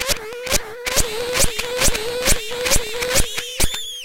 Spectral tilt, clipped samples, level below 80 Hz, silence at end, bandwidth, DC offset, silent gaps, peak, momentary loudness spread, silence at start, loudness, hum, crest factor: -1.5 dB/octave; under 0.1%; -28 dBFS; 0 s; 17 kHz; under 0.1%; none; -2 dBFS; 3 LU; 0 s; -20 LUFS; none; 18 dB